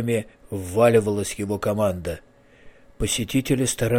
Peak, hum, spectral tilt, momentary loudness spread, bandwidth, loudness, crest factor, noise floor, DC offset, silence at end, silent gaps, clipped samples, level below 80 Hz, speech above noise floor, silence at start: -6 dBFS; none; -5 dB/octave; 15 LU; 17 kHz; -23 LUFS; 16 dB; -48 dBFS; under 0.1%; 0 s; none; under 0.1%; -42 dBFS; 26 dB; 0 s